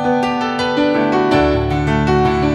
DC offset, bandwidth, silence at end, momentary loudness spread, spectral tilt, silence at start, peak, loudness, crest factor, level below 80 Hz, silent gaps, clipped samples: under 0.1%; 11 kHz; 0 s; 3 LU; -7 dB/octave; 0 s; -2 dBFS; -15 LUFS; 14 dB; -30 dBFS; none; under 0.1%